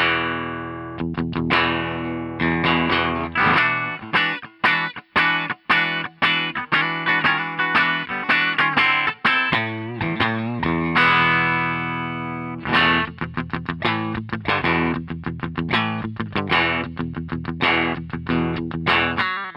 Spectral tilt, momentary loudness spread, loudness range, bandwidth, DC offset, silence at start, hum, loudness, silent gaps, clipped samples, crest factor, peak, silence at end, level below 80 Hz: -6.5 dB/octave; 11 LU; 4 LU; 10 kHz; under 0.1%; 0 s; none; -20 LUFS; none; under 0.1%; 16 dB; -4 dBFS; 0 s; -50 dBFS